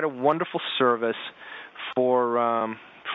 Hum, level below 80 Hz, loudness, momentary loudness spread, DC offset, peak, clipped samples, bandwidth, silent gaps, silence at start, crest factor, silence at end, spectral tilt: none; -78 dBFS; -25 LUFS; 15 LU; under 0.1%; -6 dBFS; under 0.1%; 4.1 kHz; none; 0 s; 18 dB; 0 s; -2.5 dB/octave